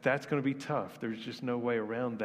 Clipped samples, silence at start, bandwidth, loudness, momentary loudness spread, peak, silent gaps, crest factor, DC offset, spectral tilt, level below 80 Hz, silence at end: under 0.1%; 0 s; 15 kHz; -34 LUFS; 7 LU; -14 dBFS; none; 20 dB; under 0.1%; -6.5 dB/octave; -74 dBFS; 0 s